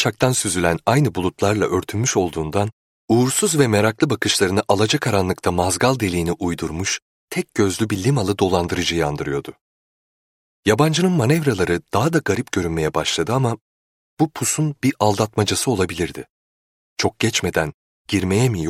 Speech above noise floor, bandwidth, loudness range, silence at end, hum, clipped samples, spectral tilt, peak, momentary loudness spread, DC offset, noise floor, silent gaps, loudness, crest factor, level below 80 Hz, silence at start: over 71 dB; 16.5 kHz; 3 LU; 0 s; none; under 0.1%; -4.5 dB/octave; -2 dBFS; 7 LU; under 0.1%; under -90 dBFS; 2.73-3.08 s, 7.02-7.28 s, 9.61-10.63 s, 13.61-14.17 s, 16.30-16.96 s, 17.74-18.05 s; -20 LUFS; 18 dB; -46 dBFS; 0 s